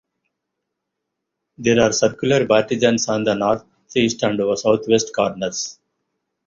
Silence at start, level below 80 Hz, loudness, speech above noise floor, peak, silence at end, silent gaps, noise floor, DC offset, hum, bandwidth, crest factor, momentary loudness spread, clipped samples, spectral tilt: 1.6 s; -54 dBFS; -19 LUFS; 61 dB; -2 dBFS; 0.75 s; none; -79 dBFS; under 0.1%; none; 7.6 kHz; 18 dB; 9 LU; under 0.1%; -4 dB/octave